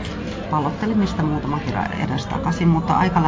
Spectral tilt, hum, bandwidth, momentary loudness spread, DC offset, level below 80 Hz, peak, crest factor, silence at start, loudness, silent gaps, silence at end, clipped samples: -7 dB/octave; none; 7.8 kHz; 6 LU; under 0.1%; -36 dBFS; -4 dBFS; 16 dB; 0 s; -21 LUFS; none; 0 s; under 0.1%